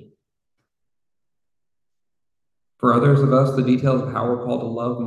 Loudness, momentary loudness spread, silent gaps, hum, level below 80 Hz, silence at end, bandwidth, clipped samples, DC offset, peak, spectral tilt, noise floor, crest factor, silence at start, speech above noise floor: -19 LUFS; 9 LU; none; none; -58 dBFS; 0 s; 9.6 kHz; under 0.1%; under 0.1%; -4 dBFS; -9 dB/octave; -88 dBFS; 18 dB; 2.8 s; 70 dB